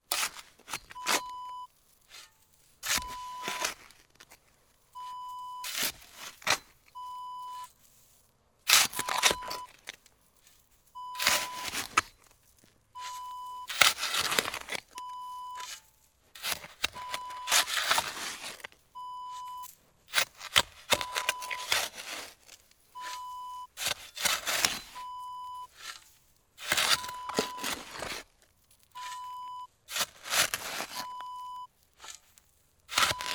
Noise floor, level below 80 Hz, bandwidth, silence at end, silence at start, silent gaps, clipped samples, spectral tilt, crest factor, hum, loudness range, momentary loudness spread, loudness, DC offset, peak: -67 dBFS; -64 dBFS; over 20 kHz; 0 s; 0.1 s; none; under 0.1%; 0.5 dB/octave; 32 dB; none; 7 LU; 20 LU; -31 LUFS; under 0.1%; -2 dBFS